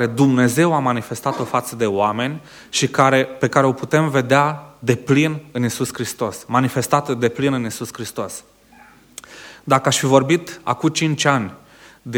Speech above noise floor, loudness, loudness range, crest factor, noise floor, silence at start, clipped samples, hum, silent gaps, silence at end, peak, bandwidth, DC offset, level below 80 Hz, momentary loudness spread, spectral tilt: 30 dB; -19 LUFS; 5 LU; 18 dB; -48 dBFS; 0 s; under 0.1%; none; none; 0 s; 0 dBFS; 19.5 kHz; under 0.1%; -58 dBFS; 13 LU; -5 dB/octave